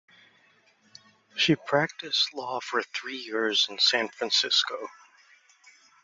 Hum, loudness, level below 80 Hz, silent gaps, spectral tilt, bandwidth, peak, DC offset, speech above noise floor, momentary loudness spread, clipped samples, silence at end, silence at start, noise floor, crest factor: none; -25 LUFS; -72 dBFS; none; -2.5 dB/octave; 7.8 kHz; -8 dBFS; under 0.1%; 36 dB; 12 LU; under 0.1%; 1.1 s; 1.35 s; -63 dBFS; 22 dB